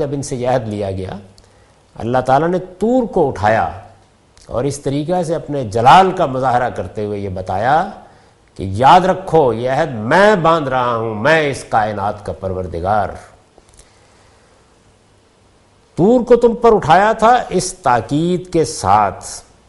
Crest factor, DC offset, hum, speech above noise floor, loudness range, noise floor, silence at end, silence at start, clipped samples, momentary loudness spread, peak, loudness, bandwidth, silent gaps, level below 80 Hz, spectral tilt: 16 dB; under 0.1%; none; 37 dB; 9 LU; -51 dBFS; 0.3 s; 0 s; under 0.1%; 13 LU; 0 dBFS; -15 LUFS; 12 kHz; none; -42 dBFS; -5.5 dB/octave